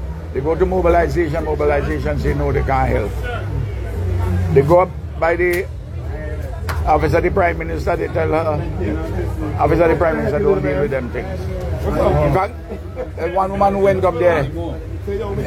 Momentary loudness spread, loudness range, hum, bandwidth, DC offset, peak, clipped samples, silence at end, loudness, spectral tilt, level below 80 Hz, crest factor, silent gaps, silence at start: 11 LU; 2 LU; none; 16 kHz; under 0.1%; 0 dBFS; under 0.1%; 0 s; -18 LUFS; -8 dB/octave; -26 dBFS; 16 dB; none; 0 s